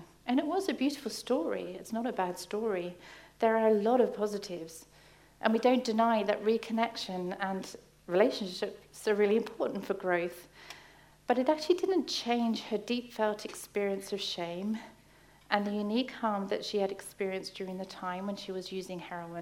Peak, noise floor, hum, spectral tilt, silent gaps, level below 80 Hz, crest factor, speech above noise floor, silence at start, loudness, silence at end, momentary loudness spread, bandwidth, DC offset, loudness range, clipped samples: -10 dBFS; -60 dBFS; none; -5 dB/octave; none; -70 dBFS; 24 dB; 28 dB; 0 s; -32 LUFS; 0 s; 12 LU; 16 kHz; under 0.1%; 4 LU; under 0.1%